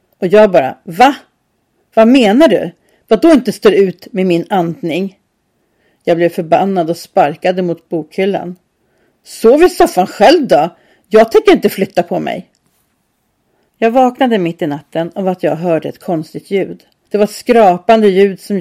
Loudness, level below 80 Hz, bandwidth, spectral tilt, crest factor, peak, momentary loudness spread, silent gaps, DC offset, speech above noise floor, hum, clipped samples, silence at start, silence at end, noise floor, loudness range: -12 LUFS; -46 dBFS; 15 kHz; -6 dB/octave; 12 dB; 0 dBFS; 12 LU; none; under 0.1%; 52 dB; none; 0.1%; 0.2 s; 0 s; -62 dBFS; 5 LU